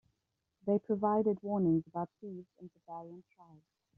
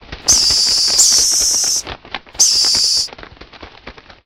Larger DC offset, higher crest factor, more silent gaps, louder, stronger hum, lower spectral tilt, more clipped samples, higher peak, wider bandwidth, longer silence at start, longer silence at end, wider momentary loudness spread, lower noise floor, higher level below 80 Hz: neither; about the same, 18 dB vs 16 dB; neither; second, -33 LUFS vs -10 LUFS; neither; first, -11.5 dB/octave vs 1.5 dB/octave; neither; second, -18 dBFS vs 0 dBFS; second, 3 kHz vs 16 kHz; first, 0.65 s vs 0.1 s; first, 0.55 s vs 0.35 s; first, 22 LU vs 15 LU; first, -85 dBFS vs -38 dBFS; second, -74 dBFS vs -42 dBFS